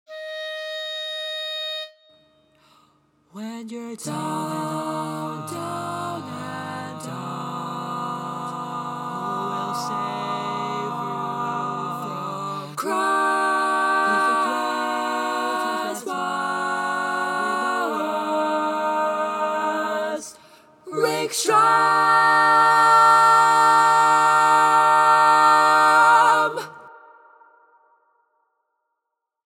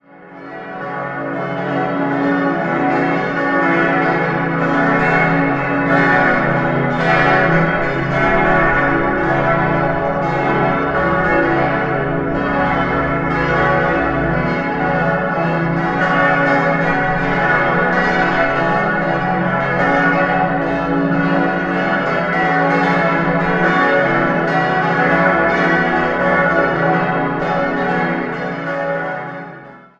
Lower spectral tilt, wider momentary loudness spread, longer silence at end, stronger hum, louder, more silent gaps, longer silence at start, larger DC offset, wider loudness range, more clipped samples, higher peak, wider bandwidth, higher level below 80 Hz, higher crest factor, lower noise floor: second, -3 dB/octave vs -7.5 dB/octave; first, 16 LU vs 6 LU; first, 2.5 s vs 0.2 s; neither; second, -20 LUFS vs -15 LUFS; neither; about the same, 0.1 s vs 0.15 s; neither; first, 16 LU vs 2 LU; neither; second, -4 dBFS vs 0 dBFS; first, 17 kHz vs 7.6 kHz; second, -76 dBFS vs -38 dBFS; about the same, 18 dB vs 16 dB; first, -81 dBFS vs -37 dBFS